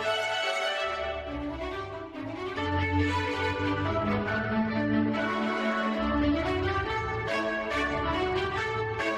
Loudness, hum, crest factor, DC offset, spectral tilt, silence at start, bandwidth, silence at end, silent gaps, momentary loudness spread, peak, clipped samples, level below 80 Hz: -29 LUFS; none; 14 dB; under 0.1%; -6 dB/octave; 0 s; 13 kHz; 0 s; none; 8 LU; -16 dBFS; under 0.1%; -46 dBFS